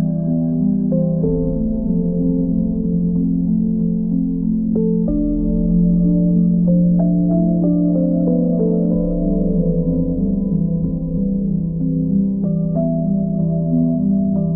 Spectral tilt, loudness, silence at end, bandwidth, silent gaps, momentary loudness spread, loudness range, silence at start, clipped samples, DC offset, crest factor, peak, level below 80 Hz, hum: -17.5 dB/octave; -17 LUFS; 0 s; 1.2 kHz; none; 4 LU; 3 LU; 0 s; under 0.1%; under 0.1%; 10 dB; -6 dBFS; -30 dBFS; none